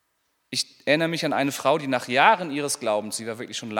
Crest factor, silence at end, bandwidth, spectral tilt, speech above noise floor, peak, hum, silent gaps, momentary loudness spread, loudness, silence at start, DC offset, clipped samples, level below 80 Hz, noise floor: 22 dB; 0 s; 18.5 kHz; -3.5 dB/octave; 48 dB; -2 dBFS; none; none; 12 LU; -23 LUFS; 0.5 s; under 0.1%; under 0.1%; -78 dBFS; -72 dBFS